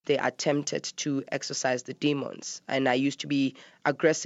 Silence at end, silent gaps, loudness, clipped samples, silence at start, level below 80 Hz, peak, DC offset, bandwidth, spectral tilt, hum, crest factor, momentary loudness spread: 0 s; none; -29 LUFS; under 0.1%; 0.05 s; -80 dBFS; -10 dBFS; under 0.1%; 8 kHz; -4 dB/octave; none; 18 dB; 6 LU